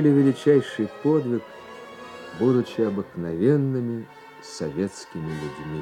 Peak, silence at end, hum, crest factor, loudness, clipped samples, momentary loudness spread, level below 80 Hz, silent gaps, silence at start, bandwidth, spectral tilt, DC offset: -6 dBFS; 0 s; none; 18 dB; -24 LUFS; under 0.1%; 20 LU; -62 dBFS; none; 0 s; 11 kHz; -7.5 dB/octave; under 0.1%